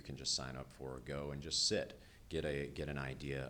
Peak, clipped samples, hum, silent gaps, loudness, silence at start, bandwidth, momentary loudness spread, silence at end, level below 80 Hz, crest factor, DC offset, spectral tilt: -24 dBFS; under 0.1%; none; none; -40 LUFS; 0 s; 20 kHz; 14 LU; 0 s; -56 dBFS; 18 dB; under 0.1%; -3 dB/octave